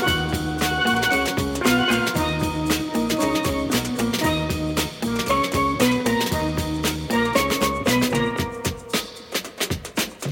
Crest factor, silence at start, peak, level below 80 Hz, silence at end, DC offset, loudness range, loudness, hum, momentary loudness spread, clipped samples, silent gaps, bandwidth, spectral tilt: 16 dB; 0 s; -6 dBFS; -38 dBFS; 0 s; under 0.1%; 2 LU; -22 LUFS; none; 7 LU; under 0.1%; none; 17 kHz; -4 dB/octave